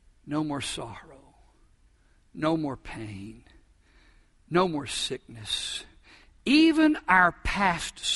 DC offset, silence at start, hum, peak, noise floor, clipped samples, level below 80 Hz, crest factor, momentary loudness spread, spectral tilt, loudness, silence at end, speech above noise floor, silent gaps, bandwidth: under 0.1%; 0.25 s; none; -6 dBFS; -61 dBFS; under 0.1%; -48 dBFS; 22 dB; 18 LU; -4 dB/octave; -26 LUFS; 0 s; 35 dB; none; 11.5 kHz